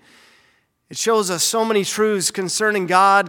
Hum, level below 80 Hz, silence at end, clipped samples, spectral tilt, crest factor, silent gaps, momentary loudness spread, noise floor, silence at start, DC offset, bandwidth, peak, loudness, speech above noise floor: none; -70 dBFS; 0 s; under 0.1%; -2.5 dB/octave; 16 dB; none; 5 LU; -60 dBFS; 0.9 s; under 0.1%; 18 kHz; -2 dBFS; -18 LUFS; 43 dB